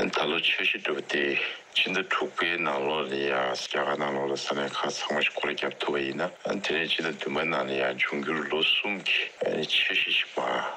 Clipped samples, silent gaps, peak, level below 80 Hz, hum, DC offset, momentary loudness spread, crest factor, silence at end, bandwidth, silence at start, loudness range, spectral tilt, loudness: under 0.1%; none; -14 dBFS; -72 dBFS; none; under 0.1%; 6 LU; 14 dB; 0 s; 15.5 kHz; 0 s; 3 LU; -3 dB/octave; -27 LUFS